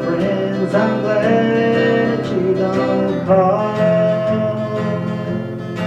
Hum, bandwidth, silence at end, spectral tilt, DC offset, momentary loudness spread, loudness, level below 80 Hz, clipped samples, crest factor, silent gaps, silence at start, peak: none; 9.2 kHz; 0 s; -8 dB/octave; under 0.1%; 7 LU; -17 LUFS; -52 dBFS; under 0.1%; 14 dB; none; 0 s; -2 dBFS